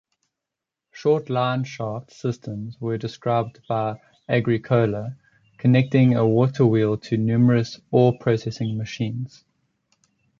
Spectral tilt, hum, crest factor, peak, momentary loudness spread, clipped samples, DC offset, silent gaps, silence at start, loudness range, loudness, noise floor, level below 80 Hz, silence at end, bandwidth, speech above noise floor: -8 dB/octave; none; 18 dB; -4 dBFS; 12 LU; under 0.1%; under 0.1%; none; 0.95 s; 7 LU; -22 LUFS; -86 dBFS; -58 dBFS; 1.15 s; 7.2 kHz; 65 dB